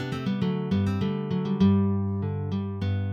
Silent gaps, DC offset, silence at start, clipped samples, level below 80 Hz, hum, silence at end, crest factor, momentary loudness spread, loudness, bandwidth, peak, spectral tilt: none; under 0.1%; 0 s; under 0.1%; -56 dBFS; none; 0 s; 16 dB; 8 LU; -26 LUFS; 6.8 kHz; -10 dBFS; -9 dB/octave